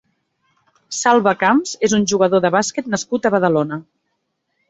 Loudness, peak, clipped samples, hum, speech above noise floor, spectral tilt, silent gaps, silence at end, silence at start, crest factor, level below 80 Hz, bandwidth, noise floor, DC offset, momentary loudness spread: -17 LUFS; 0 dBFS; under 0.1%; none; 56 dB; -4 dB/octave; none; 0.9 s; 0.9 s; 18 dB; -58 dBFS; 8.2 kHz; -72 dBFS; under 0.1%; 8 LU